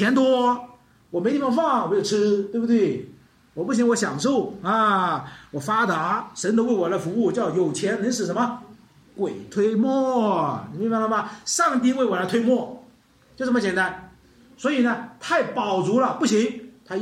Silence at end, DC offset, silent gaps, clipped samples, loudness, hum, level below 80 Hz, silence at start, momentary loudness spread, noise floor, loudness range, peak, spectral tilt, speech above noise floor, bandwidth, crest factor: 0 s; under 0.1%; none; under 0.1%; -22 LUFS; none; -64 dBFS; 0 s; 9 LU; -55 dBFS; 2 LU; -8 dBFS; -5 dB/octave; 33 dB; 14 kHz; 14 dB